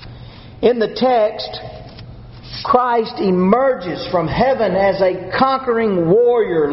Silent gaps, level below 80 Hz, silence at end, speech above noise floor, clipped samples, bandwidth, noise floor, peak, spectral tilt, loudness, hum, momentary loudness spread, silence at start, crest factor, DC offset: none; -42 dBFS; 0 s; 20 dB; under 0.1%; 6 kHz; -36 dBFS; 0 dBFS; -5 dB/octave; -16 LUFS; none; 17 LU; 0 s; 16 dB; under 0.1%